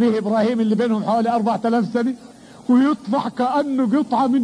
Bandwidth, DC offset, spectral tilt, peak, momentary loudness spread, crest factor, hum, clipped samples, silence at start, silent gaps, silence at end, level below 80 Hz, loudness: 10.5 kHz; under 0.1%; -7 dB/octave; -8 dBFS; 6 LU; 12 dB; none; under 0.1%; 0 s; none; 0 s; -64 dBFS; -19 LUFS